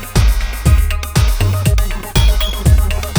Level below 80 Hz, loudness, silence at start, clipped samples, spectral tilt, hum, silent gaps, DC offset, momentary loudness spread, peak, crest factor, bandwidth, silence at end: -14 dBFS; -15 LUFS; 0 s; under 0.1%; -5 dB/octave; none; none; under 0.1%; 3 LU; 0 dBFS; 12 dB; over 20 kHz; 0 s